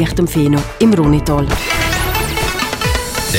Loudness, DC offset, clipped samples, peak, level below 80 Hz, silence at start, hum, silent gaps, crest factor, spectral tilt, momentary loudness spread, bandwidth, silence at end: -15 LUFS; under 0.1%; under 0.1%; 0 dBFS; -24 dBFS; 0 s; none; none; 14 dB; -5 dB/octave; 5 LU; 16.5 kHz; 0 s